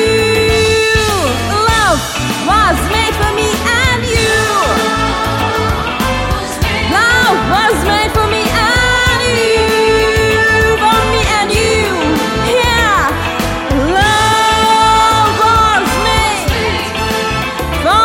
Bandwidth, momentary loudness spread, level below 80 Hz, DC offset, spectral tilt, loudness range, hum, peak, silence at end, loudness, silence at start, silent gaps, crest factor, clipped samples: 17 kHz; 6 LU; -24 dBFS; under 0.1%; -3.5 dB/octave; 2 LU; none; 0 dBFS; 0 s; -11 LUFS; 0 s; none; 12 dB; under 0.1%